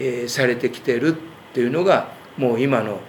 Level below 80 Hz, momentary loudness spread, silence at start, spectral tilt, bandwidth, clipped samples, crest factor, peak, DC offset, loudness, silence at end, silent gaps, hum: -68 dBFS; 8 LU; 0 s; -5.5 dB/octave; 20 kHz; under 0.1%; 20 dB; 0 dBFS; under 0.1%; -21 LUFS; 0 s; none; none